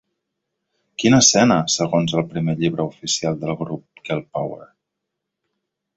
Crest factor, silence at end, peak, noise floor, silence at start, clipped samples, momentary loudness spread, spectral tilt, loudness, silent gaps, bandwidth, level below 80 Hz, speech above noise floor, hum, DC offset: 20 dB; 1.35 s; -2 dBFS; -80 dBFS; 1 s; under 0.1%; 17 LU; -4 dB/octave; -19 LUFS; none; 8.2 kHz; -56 dBFS; 61 dB; none; under 0.1%